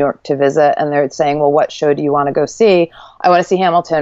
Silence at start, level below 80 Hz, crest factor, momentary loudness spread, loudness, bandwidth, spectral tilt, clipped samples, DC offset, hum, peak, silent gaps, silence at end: 0 s; -54 dBFS; 12 dB; 5 LU; -13 LUFS; 8 kHz; -5.5 dB/octave; under 0.1%; under 0.1%; none; 0 dBFS; none; 0 s